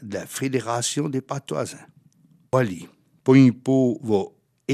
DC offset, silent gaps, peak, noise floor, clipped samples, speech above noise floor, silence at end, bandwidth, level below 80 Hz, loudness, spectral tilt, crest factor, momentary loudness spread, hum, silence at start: under 0.1%; none; -4 dBFS; -58 dBFS; under 0.1%; 36 dB; 0 s; 14.5 kHz; -70 dBFS; -22 LUFS; -6 dB/octave; 20 dB; 16 LU; none; 0 s